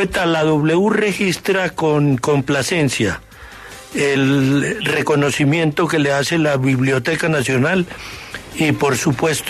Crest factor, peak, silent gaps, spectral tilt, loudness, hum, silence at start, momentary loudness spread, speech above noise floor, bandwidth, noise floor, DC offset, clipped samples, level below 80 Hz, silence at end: 12 dB; -4 dBFS; none; -5 dB/octave; -17 LUFS; none; 0 s; 11 LU; 20 dB; 13.5 kHz; -37 dBFS; under 0.1%; under 0.1%; -46 dBFS; 0 s